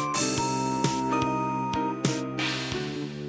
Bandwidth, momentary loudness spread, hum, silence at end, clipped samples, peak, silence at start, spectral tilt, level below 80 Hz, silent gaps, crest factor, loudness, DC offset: 8 kHz; 4 LU; none; 0 s; under 0.1%; -10 dBFS; 0 s; -4 dB/octave; -54 dBFS; none; 18 dB; -28 LUFS; under 0.1%